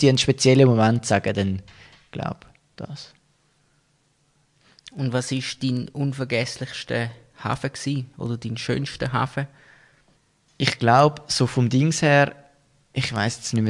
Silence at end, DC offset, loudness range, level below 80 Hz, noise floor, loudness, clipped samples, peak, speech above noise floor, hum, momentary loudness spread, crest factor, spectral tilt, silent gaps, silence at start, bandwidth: 0 s; under 0.1%; 12 LU; -56 dBFS; -65 dBFS; -22 LUFS; under 0.1%; -2 dBFS; 43 dB; none; 16 LU; 22 dB; -5.5 dB/octave; none; 0 s; 11.5 kHz